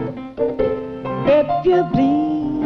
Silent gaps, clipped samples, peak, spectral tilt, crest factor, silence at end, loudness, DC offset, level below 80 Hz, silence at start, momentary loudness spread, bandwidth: none; under 0.1%; -6 dBFS; -9 dB/octave; 12 dB; 0 s; -18 LUFS; under 0.1%; -44 dBFS; 0 s; 10 LU; 6.4 kHz